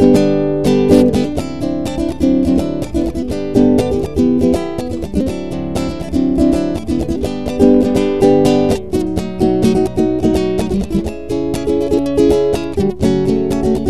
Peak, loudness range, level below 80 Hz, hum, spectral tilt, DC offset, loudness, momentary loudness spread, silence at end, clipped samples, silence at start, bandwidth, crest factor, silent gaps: 0 dBFS; 3 LU; -30 dBFS; none; -7 dB/octave; 3%; -15 LUFS; 9 LU; 0 s; under 0.1%; 0 s; 13.5 kHz; 14 dB; none